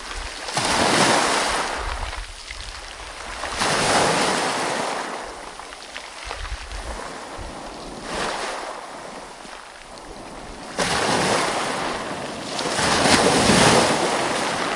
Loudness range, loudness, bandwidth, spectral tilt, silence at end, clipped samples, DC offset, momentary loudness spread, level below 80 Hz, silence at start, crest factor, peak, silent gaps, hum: 13 LU; -21 LUFS; 11.5 kHz; -2.5 dB/octave; 0 s; under 0.1%; under 0.1%; 20 LU; -40 dBFS; 0 s; 22 dB; 0 dBFS; none; none